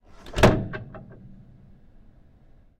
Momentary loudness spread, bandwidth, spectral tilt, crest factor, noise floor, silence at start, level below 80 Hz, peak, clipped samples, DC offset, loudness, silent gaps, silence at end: 25 LU; 16 kHz; -6 dB/octave; 20 dB; -53 dBFS; 0.25 s; -38 dBFS; -8 dBFS; under 0.1%; under 0.1%; -23 LUFS; none; 1.8 s